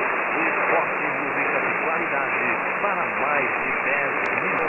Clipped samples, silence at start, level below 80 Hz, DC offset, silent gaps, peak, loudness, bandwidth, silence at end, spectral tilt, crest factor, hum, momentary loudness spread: under 0.1%; 0 s; -64 dBFS; under 0.1%; none; -8 dBFS; -22 LUFS; 10 kHz; 0 s; -6.5 dB/octave; 16 dB; none; 2 LU